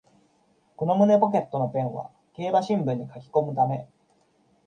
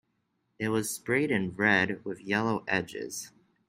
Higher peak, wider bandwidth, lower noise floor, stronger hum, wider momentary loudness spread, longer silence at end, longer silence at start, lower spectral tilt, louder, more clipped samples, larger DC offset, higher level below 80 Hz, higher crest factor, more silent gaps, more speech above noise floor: first, -6 dBFS vs -10 dBFS; second, 9 kHz vs 16 kHz; second, -65 dBFS vs -77 dBFS; neither; about the same, 14 LU vs 13 LU; first, 0.8 s vs 0.4 s; first, 0.8 s vs 0.6 s; first, -8.5 dB/octave vs -4.5 dB/octave; first, -25 LUFS vs -29 LUFS; neither; neither; about the same, -70 dBFS vs -68 dBFS; about the same, 20 dB vs 20 dB; neither; second, 41 dB vs 47 dB